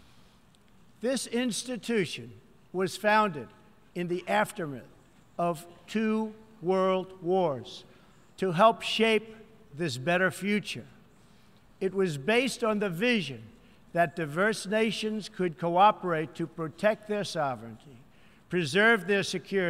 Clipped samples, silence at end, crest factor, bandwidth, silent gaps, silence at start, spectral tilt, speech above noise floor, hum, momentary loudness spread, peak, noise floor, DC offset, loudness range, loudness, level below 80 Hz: under 0.1%; 0 s; 22 dB; 16 kHz; none; 1 s; -4.5 dB/octave; 32 dB; none; 16 LU; -8 dBFS; -60 dBFS; under 0.1%; 3 LU; -28 LUFS; -68 dBFS